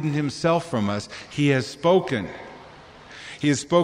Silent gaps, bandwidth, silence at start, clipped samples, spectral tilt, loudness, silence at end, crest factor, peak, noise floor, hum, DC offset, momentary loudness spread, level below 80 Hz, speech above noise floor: none; 11.5 kHz; 0 s; under 0.1%; -5.5 dB/octave; -23 LUFS; 0 s; 18 dB; -6 dBFS; -45 dBFS; none; under 0.1%; 19 LU; -58 dBFS; 23 dB